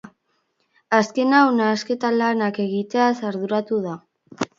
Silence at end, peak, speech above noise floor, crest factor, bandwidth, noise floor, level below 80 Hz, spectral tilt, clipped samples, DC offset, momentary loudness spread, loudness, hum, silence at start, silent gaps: 0.15 s; -2 dBFS; 50 dB; 20 dB; 7.6 kHz; -69 dBFS; -70 dBFS; -5.5 dB/octave; under 0.1%; under 0.1%; 10 LU; -20 LUFS; none; 0.05 s; none